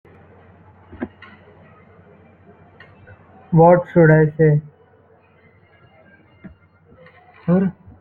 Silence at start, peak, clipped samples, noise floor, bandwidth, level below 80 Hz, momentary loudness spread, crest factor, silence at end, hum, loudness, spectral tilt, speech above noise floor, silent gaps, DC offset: 0.95 s; -2 dBFS; under 0.1%; -53 dBFS; 3.1 kHz; -52 dBFS; 21 LU; 18 dB; 0.3 s; none; -15 LUFS; -12.5 dB/octave; 39 dB; none; under 0.1%